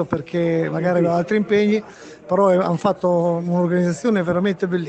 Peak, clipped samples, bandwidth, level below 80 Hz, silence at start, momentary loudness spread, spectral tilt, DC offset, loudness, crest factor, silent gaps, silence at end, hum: -4 dBFS; under 0.1%; 8.6 kHz; -58 dBFS; 0 s; 5 LU; -7.5 dB/octave; under 0.1%; -19 LUFS; 14 dB; none; 0 s; none